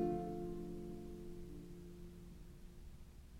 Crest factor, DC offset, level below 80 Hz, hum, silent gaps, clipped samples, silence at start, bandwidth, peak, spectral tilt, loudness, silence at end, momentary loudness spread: 18 dB; under 0.1%; -56 dBFS; none; none; under 0.1%; 0 s; 16 kHz; -28 dBFS; -8 dB/octave; -50 LUFS; 0 s; 15 LU